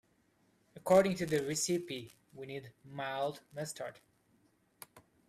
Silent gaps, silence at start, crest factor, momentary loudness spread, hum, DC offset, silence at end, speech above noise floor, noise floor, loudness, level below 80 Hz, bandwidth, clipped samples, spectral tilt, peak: none; 0.75 s; 22 dB; 26 LU; none; under 0.1%; 0.3 s; 38 dB; -72 dBFS; -34 LUFS; -70 dBFS; 15.5 kHz; under 0.1%; -4.5 dB/octave; -16 dBFS